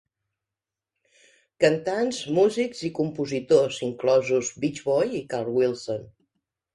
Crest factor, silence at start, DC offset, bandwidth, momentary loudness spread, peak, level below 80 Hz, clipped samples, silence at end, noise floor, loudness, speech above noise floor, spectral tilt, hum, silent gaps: 20 dB; 1.6 s; under 0.1%; 11.5 kHz; 8 LU; -6 dBFS; -66 dBFS; under 0.1%; 0.7 s; -89 dBFS; -24 LUFS; 65 dB; -5 dB/octave; none; none